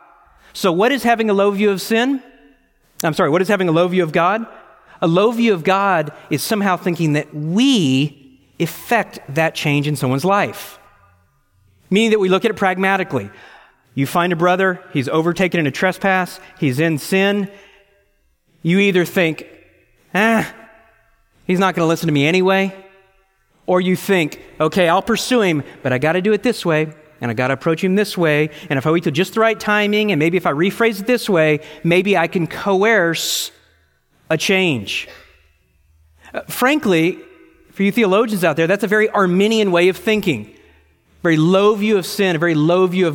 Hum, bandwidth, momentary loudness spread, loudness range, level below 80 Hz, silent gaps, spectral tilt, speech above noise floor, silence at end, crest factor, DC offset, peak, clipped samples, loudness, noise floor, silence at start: none; 17 kHz; 9 LU; 3 LU; -56 dBFS; none; -5.5 dB/octave; 44 dB; 0 s; 16 dB; under 0.1%; -2 dBFS; under 0.1%; -17 LUFS; -60 dBFS; 0.55 s